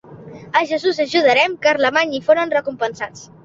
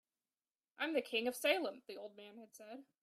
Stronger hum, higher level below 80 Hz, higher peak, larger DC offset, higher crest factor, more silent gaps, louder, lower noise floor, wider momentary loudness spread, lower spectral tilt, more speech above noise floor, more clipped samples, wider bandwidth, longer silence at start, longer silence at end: neither; first, -62 dBFS vs under -90 dBFS; first, -2 dBFS vs -20 dBFS; neither; second, 16 dB vs 22 dB; neither; first, -17 LUFS vs -38 LUFS; second, -37 dBFS vs under -90 dBFS; second, 10 LU vs 20 LU; first, -3.5 dB/octave vs -2 dB/octave; second, 20 dB vs over 49 dB; neither; second, 7.8 kHz vs 15.5 kHz; second, 0.1 s vs 0.8 s; about the same, 0.2 s vs 0.2 s